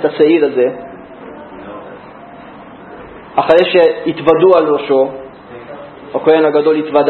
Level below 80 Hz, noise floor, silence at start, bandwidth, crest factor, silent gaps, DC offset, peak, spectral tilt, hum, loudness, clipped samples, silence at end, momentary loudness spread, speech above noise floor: -52 dBFS; -34 dBFS; 0 s; 4.4 kHz; 14 dB; none; under 0.1%; 0 dBFS; -8 dB/octave; none; -12 LUFS; under 0.1%; 0 s; 24 LU; 23 dB